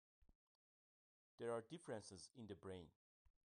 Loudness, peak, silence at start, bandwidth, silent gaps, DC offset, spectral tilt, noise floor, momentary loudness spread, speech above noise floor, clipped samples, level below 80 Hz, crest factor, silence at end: -54 LUFS; -34 dBFS; 0.2 s; 10 kHz; 0.35-1.38 s, 2.96-3.25 s; under 0.1%; -5 dB/octave; under -90 dBFS; 10 LU; over 34 dB; under 0.1%; -84 dBFS; 22 dB; 0.3 s